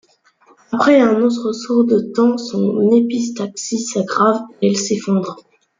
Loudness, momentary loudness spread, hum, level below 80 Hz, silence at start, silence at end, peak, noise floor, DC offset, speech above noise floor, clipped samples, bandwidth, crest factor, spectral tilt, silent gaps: -16 LUFS; 10 LU; none; -64 dBFS; 0.7 s; 0.4 s; -2 dBFS; -53 dBFS; under 0.1%; 37 dB; under 0.1%; 9.4 kHz; 14 dB; -5 dB/octave; none